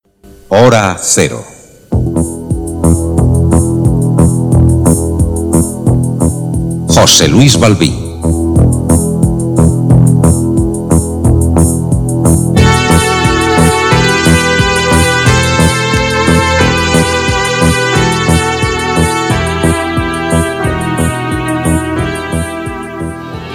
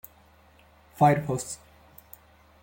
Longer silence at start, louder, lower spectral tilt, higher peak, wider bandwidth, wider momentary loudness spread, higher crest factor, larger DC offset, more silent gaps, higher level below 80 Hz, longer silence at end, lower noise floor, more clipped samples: second, 0.3 s vs 1 s; first, -10 LUFS vs -25 LUFS; about the same, -5 dB/octave vs -6 dB/octave; first, 0 dBFS vs -8 dBFS; about the same, 18.5 kHz vs 17 kHz; second, 8 LU vs 27 LU; second, 10 dB vs 22 dB; neither; neither; first, -22 dBFS vs -60 dBFS; second, 0 s vs 1.1 s; second, -38 dBFS vs -57 dBFS; first, 1% vs under 0.1%